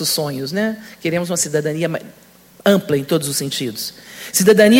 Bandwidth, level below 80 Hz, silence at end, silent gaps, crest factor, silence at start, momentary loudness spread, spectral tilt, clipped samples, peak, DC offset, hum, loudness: 17 kHz; -58 dBFS; 0 s; none; 18 dB; 0 s; 10 LU; -4 dB/octave; under 0.1%; 0 dBFS; under 0.1%; none; -19 LUFS